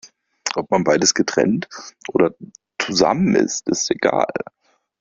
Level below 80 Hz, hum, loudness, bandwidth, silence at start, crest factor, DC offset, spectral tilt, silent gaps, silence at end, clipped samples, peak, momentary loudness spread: -56 dBFS; none; -19 LUFS; 7.8 kHz; 0.05 s; 18 dB; under 0.1%; -3.5 dB/octave; none; 0.6 s; under 0.1%; -2 dBFS; 14 LU